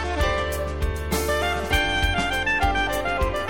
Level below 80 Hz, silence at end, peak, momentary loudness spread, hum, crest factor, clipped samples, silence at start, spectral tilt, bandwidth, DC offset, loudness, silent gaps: -30 dBFS; 0 s; -8 dBFS; 6 LU; none; 14 dB; under 0.1%; 0 s; -4 dB/octave; 19 kHz; 0.9%; -23 LUFS; none